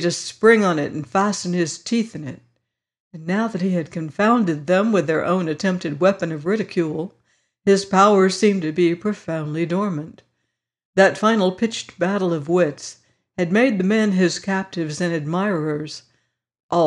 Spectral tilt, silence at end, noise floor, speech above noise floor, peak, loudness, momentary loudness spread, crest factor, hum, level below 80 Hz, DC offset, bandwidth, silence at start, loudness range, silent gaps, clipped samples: -5.5 dB/octave; 0 s; -77 dBFS; 57 dB; -4 dBFS; -20 LUFS; 12 LU; 16 dB; none; -64 dBFS; under 0.1%; 11 kHz; 0 s; 3 LU; 3.00-3.11 s, 10.85-10.93 s, 16.63-16.69 s; under 0.1%